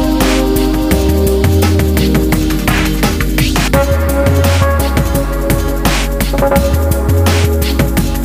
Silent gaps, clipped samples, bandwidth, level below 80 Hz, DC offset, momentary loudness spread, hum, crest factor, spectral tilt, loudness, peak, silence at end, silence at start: none; under 0.1%; 16 kHz; -16 dBFS; under 0.1%; 3 LU; none; 12 dB; -5.5 dB/octave; -12 LUFS; 0 dBFS; 0 s; 0 s